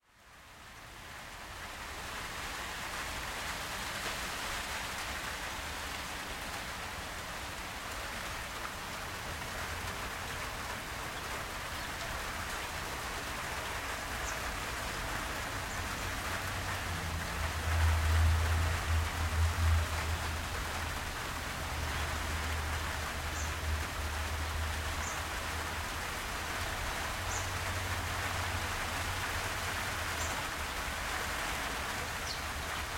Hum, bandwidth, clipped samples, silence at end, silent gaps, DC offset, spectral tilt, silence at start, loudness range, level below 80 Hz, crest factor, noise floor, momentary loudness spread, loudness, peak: none; 16.5 kHz; under 0.1%; 0 s; none; under 0.1%; -3 dB/octave; 0.2 s; 7 LU; -44 dBFS; 18 dB; -57 dBFS; 7 LU; -36 LUFS; -18 dBFS